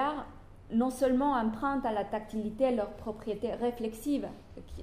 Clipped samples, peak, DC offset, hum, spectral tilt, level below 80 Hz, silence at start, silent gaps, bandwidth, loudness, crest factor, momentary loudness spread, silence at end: under 0.1%; -16 dBFS; under 0.1%; none; -6 dB/octave; -52 dBFS; 0 s; none; 15.5 kHz; -32 LUFS; 16 dB; 13 LU; 0 s